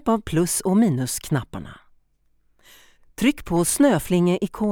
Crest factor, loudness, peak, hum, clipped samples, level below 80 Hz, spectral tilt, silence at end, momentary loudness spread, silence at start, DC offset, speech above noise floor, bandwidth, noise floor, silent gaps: 16 dB; -21 LUFS; -6 dBFS; none; under 0.1%; -46 dBFS; -5.5 dB/octave; 0 s; 9 LU; 0.05 s; under 0.1%; 42 dB; 19.5 kHz; -63 dBFS; none